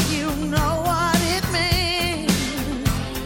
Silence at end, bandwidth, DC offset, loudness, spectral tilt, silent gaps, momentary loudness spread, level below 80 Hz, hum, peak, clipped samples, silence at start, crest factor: 0 s; 17 kHz; under 0.1%; -21 LUFS; -4 dB/octave; none; 5 LU; -32 dBFS; none; -6 dBFS; under 0.1%; 0 s; 16 dB